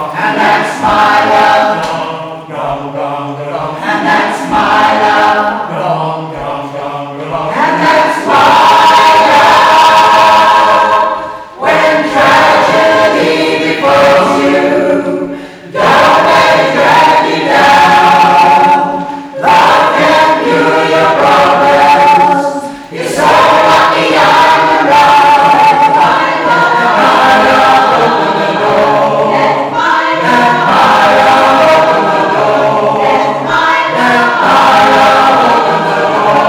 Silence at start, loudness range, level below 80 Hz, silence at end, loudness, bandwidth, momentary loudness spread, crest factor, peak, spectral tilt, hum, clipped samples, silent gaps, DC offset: 0 s; 5 LU; -46 dBFS; 0 s; -7 LUFS; over 20 kHz; 12 LU; 8 dB; 0 dBFS; -4 dB/octave; none; 0.2%; none; under 0.1%